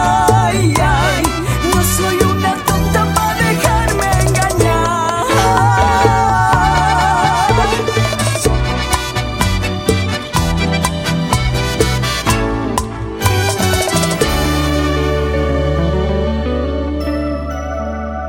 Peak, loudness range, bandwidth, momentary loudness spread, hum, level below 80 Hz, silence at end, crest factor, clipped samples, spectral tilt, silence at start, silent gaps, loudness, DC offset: 0 dBFS; 4 LU; 17 kHz; 7 LU; none; -24 dBFS; 0 s; 14 dB; under 0.1%; -4.5 dB/octave; 0 s; none; -14 LUFS; under 0.1%